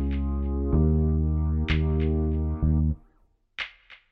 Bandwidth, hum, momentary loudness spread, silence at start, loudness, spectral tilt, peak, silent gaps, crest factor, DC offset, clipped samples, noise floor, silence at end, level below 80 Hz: 5.6 kHz; none; 12 LU; 0 s; -26 LUFS; -9.5 dB/octave; -10 dBFS; none; 14 dB; under 0.1%; under 0.1%; -64 dBFS; 0.2 s; -30 dBFS